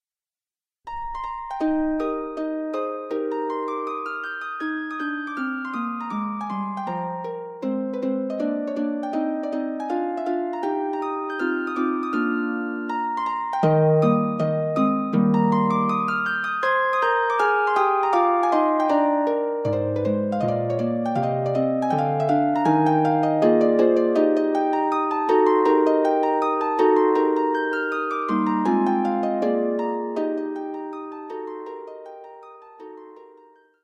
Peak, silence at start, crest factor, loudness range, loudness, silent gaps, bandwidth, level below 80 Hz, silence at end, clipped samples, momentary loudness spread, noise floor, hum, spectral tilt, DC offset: -6 dBFS; 0.85 s; 16 dB; 8 LU; -23 LUFS; none; 8.8 kHz; -58 dBFS; 0.6 s; under 0.1%; 11 LU; under -90 dBFS; none; -8 dB/octave; under 0.1%